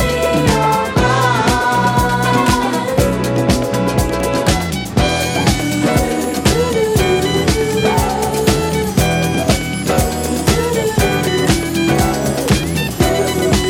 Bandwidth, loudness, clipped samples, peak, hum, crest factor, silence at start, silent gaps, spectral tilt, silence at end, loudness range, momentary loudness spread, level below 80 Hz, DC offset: 17 kHz; -15 LUFS; under 0.1%; 0 dBFS; none; 14 dB; 0 s; none; -5 dB/octave; 0 s; 1 LU; 3 LU; -26 dBFS; under 0.1%